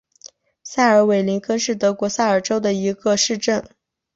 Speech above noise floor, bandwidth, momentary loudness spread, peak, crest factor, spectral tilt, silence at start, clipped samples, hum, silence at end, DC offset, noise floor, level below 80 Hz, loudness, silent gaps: 29 dB; 8 kHz; 6 LU; -2 dBFS; 16 dB; -4 dB/octave; 0.25 s; under 0.1%; none; 0.5 s; under 0.1%; -47 dBFS; -60 dBFS; -19 LUFS; none